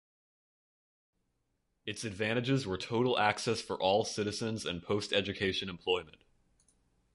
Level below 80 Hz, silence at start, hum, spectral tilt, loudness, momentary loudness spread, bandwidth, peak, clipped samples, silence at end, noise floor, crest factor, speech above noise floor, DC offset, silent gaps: -62 dBFS; 1.85 s; none; -4.5 dB/octave; -33 LUFS; 7 LU; 11.5 kHz; -12 dBFS; under 0.1%; 1.05 s; -80 dBFS; 24 dB; 47 dB; under 0.1%; none